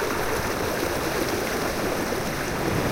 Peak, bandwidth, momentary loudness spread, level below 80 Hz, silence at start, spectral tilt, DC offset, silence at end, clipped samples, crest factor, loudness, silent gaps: -12 dBFS; 16 kHz; 1 LU; -40 dBFS; 0 s; -4 dB/octave; under 0.1%; 0 s; under 0.1%; 14 dB; -26 LUFS; none